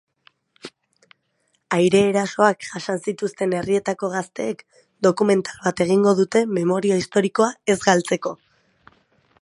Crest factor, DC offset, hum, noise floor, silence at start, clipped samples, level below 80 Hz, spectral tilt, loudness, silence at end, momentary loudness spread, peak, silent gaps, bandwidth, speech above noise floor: 22 dB; under 0.1%; none; -69 dBFS; 0.65 s; under 0.1%; -62 dBFS; -5 dB/octave; -20 LUFS; 1.1 s; 12 LU; 0 dBFS; none; 11.5 kHz; 49 dB